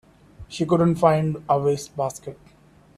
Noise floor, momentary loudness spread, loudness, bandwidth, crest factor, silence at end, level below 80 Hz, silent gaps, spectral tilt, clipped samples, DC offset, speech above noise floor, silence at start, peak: -53 dBFS; 19 LU; -22 LUFS; 13.5 kHz; 20 dB; 0.65 s; -52 dBFS; none; -7 dB/octave; under 0.1%; under 0.1%; 32 dB; 0.4 s; -4 dBFS